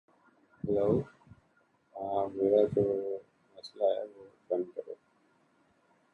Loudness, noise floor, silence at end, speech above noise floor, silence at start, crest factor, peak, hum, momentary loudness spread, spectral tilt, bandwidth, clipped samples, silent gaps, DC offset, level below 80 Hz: -32 LUFS; -70 dBFS; 1.2 s; 40 dB; 0.65 s; 20 dB; -14 dBFS; none; 22 LU; -9 dB/octave; 6.6 kHz; under 0.1%; none; under 0.1%; -64 dBFS